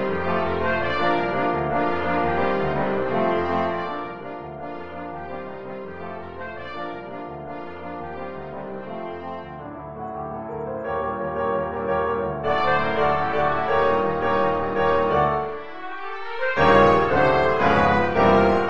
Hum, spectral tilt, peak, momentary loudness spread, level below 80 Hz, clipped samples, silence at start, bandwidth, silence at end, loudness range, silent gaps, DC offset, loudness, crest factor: none; -7.5 dB/octave; -2 dBFS; 16 LU; -46 dBFS; under 0.1%; 0 s; 7.6 kHz; 0 s; 14 LU; none; 1%; -22 LUFS; 20 dB